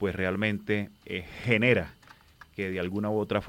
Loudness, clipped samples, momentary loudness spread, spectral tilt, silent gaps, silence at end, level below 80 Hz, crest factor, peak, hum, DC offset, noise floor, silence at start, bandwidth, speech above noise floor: -29 LUFS; under 0.1%; 13 LU; -7 dB/octave; none; 0 s; -58 dBFS; 22 dB; -8 dBFS; none; under 0.1%; -54 dBFS; 0 s; 16.5 kHz; 26 dB